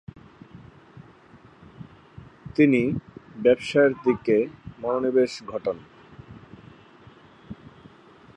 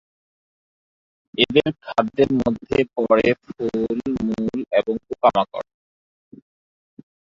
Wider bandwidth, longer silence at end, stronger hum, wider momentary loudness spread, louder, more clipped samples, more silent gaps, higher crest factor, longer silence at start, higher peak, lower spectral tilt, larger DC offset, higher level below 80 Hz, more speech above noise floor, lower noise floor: first, 10.5 kHz vs 7.6 kHz; second, 0.8 s vs 1.6 s; neither; first, 26 LU vs 9 LU; about the same, -23 LUFS vs -21 LUFS; neither; neither; about the same, 20 dB vs 20 dB; second, 0.55 s vs 1.4 s; second, -6 dBFS vs -2 dBFS; about the same, -7 dB/octave vs -6.5 dB/octave; neither; second, -58 dBFS vs -52 dBFS; second, 30 dB vs over 70 dB; second, -52 dBFS vs under -90 dBFS